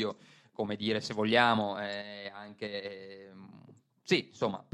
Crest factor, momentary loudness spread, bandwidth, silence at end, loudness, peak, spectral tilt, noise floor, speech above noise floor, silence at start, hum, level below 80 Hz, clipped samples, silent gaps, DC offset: 24 dB; 24 LU; 11.5 kHz; 0.15 s; -32 LUFS; -8 dBFS; -5 dB/octave; -59 dBFS; 26 dB; 0 s; none; -74 dBFS; under 0.1%; none; under 0.1%